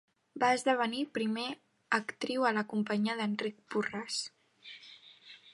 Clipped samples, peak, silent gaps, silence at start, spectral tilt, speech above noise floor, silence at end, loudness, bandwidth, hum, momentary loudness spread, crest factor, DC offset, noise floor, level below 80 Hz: under 0.1%; -14 dBFS; none; 0.35 s; -4 dB/octave; 24 dB; 0.05 s; -33 LUFS; 11.5 kHz; none; 21 LU; 20 dB; under 0.1%; -56 dBFS; -82 dBFS